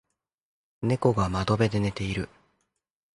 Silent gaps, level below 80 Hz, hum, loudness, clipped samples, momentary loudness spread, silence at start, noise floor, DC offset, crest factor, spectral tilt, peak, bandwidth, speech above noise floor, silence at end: none; -46 dBFS; none; -27 LUFS; under 0.1%; 9 LU; 0.8 s; -79 dBFS; under 0.1%; 22 dB; -7 dB/octave; -6 dBFS; 11 kHz; 54 dB; 0.9 s